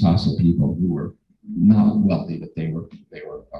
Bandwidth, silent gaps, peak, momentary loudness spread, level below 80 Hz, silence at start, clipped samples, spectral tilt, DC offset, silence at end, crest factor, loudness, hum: 6 kHz; none; -4 dBFS; 21 LU; -40 dBFS; 0 s; under 0.1%; -9.5 dB/octave; under 0.1%; 0 s; 16 dB; -20 LUFS; none